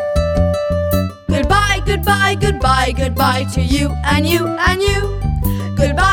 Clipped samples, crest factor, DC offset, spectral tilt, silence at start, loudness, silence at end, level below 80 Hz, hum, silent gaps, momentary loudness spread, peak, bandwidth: under 0.1%; 14 dB; under 0.1%; -5 dB/octave; 0 s; -16 LUFS; 0 s; -22 dBFS; none; none; 5 LU; 0 dBFS; 19 kHz